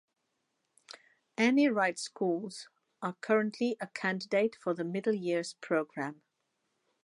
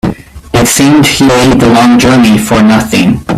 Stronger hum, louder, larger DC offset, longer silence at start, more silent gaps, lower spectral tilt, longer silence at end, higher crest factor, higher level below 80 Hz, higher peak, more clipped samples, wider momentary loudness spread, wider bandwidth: neither; second, -32 LUFS vs -6 LUFS; neither; first, 1.4 s vs 0.05 s; neither; about the same, -5 dB/octave vs -4.5 dB/octave; first, 0.9 s vs 0 s; first, 20 dB vs 6 dB; second, -88 dBFS vs -28 dBFS; second, -14 dBFS vs 0 dBFS; second, under 0.1% vs 0.3%; first, 17 LU vs 4 LU; second, 11.5 kHz vs 15.5 kHz